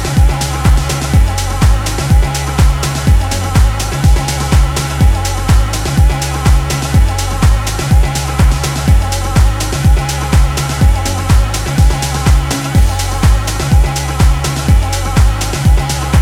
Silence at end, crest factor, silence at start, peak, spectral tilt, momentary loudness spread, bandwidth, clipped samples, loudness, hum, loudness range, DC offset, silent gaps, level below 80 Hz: 0 s; 10 dB; 0 s; 0 dBFS; -5 dB/octave; 2 LU; 16 kHz; under 0.1%; -13 LUFS; none; 0 LU; under 0.1%; none; -12 dBFS